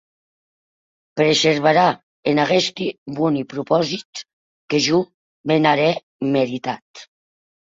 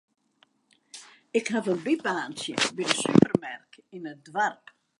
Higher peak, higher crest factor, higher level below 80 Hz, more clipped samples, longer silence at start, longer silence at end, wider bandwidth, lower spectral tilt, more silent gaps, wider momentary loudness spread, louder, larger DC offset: about the same, -2 dBFS vs -2 dBFS; second, 18 dB vs 26 dB; about the same, -62 dBFS vs -64 dBFS; neither; first, 1.15 s vs 0.95 s; first, 0.75 s vs 0.45 s; second, 7.8 kHz vs 11.5 kHz; about the same, -4.5 dB/octave vs -4.5 dB/octave; first, 2.03-2.23 s, 2.98-3.06 s, 4.05-4.13 s, 4.33-4.68 s, 5.14-5.44 s, 6.03-6.19 s, 6.82-6.94 s vs none; second, 14 LU vs 25 LU; first, -19 LUFS vs -26 LUFS; neither